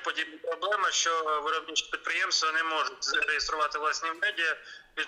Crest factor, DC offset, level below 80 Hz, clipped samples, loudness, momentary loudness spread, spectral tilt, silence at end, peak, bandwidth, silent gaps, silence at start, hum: 16 dB; under 0.1%; -62 dBFS; under 0.1%; -28 LUFS; 7 LU; 1.5 dB/octave; 0 s; -14 dBFS; 13 kHz; none; 0 s; none